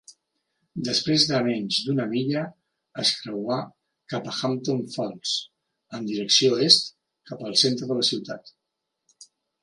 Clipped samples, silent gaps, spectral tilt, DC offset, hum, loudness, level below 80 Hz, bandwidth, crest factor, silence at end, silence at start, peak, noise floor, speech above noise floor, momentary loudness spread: under 0.1%; none; -3.5 dB/octave; under 0.1%; none; -23 LUFS; -70 dBFS; 11.5 kHz; 24 dB; 0.4 s; 0.1 s; -2 dBFS; -82 dBFS; 57 dB; 19 LU